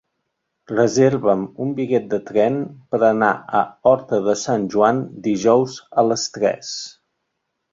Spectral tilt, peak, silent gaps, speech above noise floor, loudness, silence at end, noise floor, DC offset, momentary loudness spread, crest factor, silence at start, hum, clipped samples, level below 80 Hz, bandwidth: -5 dB/octave; -2 dBFS; none; 57 dB; -19 LUFS; 0.8 s; -75 dBFS; under 0.1%; 9 LU; 18 dB; 0.7 s; none; under 0.1%; -60 dBFS; 7.8 kHz